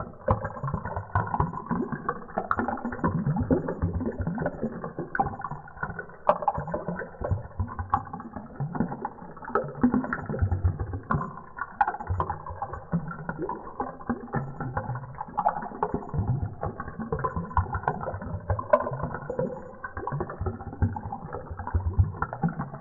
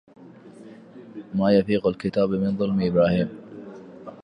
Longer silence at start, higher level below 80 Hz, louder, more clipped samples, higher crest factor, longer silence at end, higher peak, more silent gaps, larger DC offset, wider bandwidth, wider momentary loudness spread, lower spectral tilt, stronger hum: second, 0 s vs 0.2 s; first, -42 dBFS vs -52 dBFS; second, -31 LUFS vs -22 LUFS; neither; first, 26 dB vs 18 dB; about the same, 0 s vs 0.05 s; about the same, -4 dBFS vs -6 dBFS; neither; neither; second, 3.9 kHz vs 5.6 kHz; second, 10 LU vs 22 LU; first, -11.5 dB/octave vs -9 dB/octave; neither